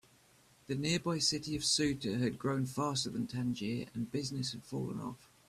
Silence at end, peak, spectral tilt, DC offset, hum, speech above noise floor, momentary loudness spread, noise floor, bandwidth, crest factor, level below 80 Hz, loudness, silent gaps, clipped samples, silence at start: 0.25 s; -18 dBFS; -4 dB/octave; under 0.1%; none; 30 dB; 9 LU; -65 dBFS; 14.5 kHz; 18 dB; -64 dBFS; -35 LUFS; none; under 0.1%; 0.7 s